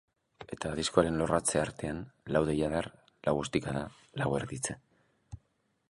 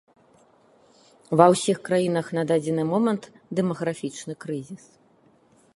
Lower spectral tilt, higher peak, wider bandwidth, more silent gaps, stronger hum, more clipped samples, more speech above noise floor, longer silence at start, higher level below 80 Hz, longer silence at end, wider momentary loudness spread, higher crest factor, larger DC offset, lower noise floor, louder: second, -4.5 dB/octave vs -6 dB/octave; second, -8 dBFS vs 0 dBFS; about the same, 12 kHz vs 11.5 kHz; neither; neither; neither; first, 44 dB vs 36 dB; second, 0.4 s vs 1.3 s; first, -54 dBFS vs -70 dBFS; second, 0.55 s vs 1 s; first, 19 LU vs 16 LU; about the same, 24 dB vs 24 dB; neither; first, -75 dBFS vs -59 dBFS; second, -32 LUFS vs -24 LUFS